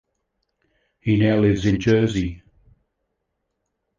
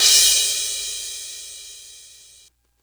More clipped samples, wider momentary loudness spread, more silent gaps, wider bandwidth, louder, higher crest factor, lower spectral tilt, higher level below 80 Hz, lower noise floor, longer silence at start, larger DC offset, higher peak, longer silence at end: neither; second, 11 LU vs 26 LU; neither; second, 7.4 kHz vs over 20 kHz; second, -20 LUFS vs -17 LUFS; about the same, 18 dB vs 22 dB; first, -7.5 dB/octave vs 4 dB/octave; first, -42 dBFS vs -54 dBFS; first, -76 dBFS vs -54 dBFS; first, 1.05 s vs 0 s; neither; second, -6 dBFS vs 0 dBFS; first, 1.6 s vs 0.8 s